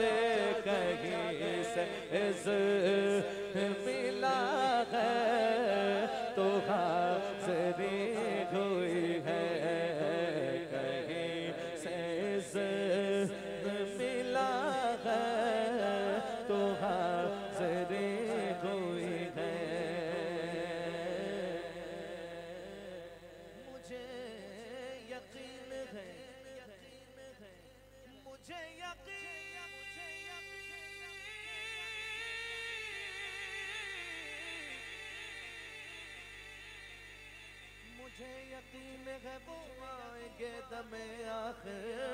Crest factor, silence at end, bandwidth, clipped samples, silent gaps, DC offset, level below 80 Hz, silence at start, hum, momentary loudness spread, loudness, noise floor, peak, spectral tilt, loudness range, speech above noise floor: 16 dB; 0 s; 16 kHz; under 0.1%; none; under 0.1%; -68 dBFS; 0 s; 50 Hz at -60 dBFS; 18 LU; -36 LUFS; -59 dBFS; -20 dBFS; -5 dB/octave; 16 LU; 25 dB